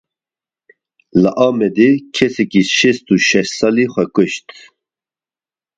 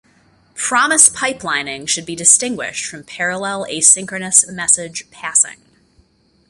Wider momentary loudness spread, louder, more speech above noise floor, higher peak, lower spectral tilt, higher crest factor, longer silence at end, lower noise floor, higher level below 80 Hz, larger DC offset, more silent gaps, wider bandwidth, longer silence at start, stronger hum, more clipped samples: second, 5 LU vs 13 LU; about the same, -14 LUFS vs -14 LUFS; first, over 76 dB vs 39 dB; about the same, 0 dBFS vs 0 dBFS; first, -4.5 dB/octave vs -0.5 dB/octave; about the same, 16 dB vs 18 dB; first, 1.4 s vs 0.95 s; first, under -90 dBFS vs -56 dBFS; about the same, -54 dBFS vs -58 dBFS; neither; neither; second, 9.2 kHz vs 16 kHz; first, 1.15 s vs 0.55 s; neither; neither